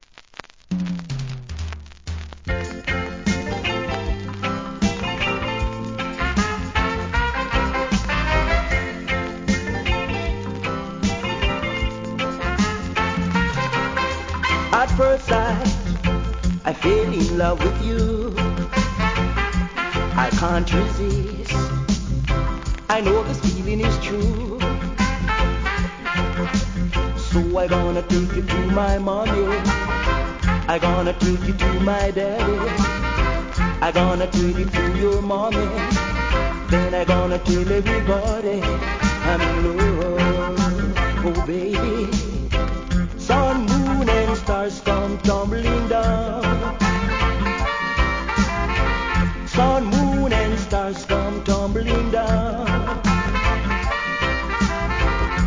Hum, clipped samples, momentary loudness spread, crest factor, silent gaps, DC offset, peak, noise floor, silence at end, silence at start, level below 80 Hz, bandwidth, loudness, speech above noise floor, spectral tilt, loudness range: none; under 0.1%; 6 LU; 18 dB; none; 0.2%; -4 dBFS; -42 dBFS; 0 s; 0.7 s; -26 dBFS; 7.6 kHz; -21 LUFS; 24 dB; -6 dB/octave; 3 LU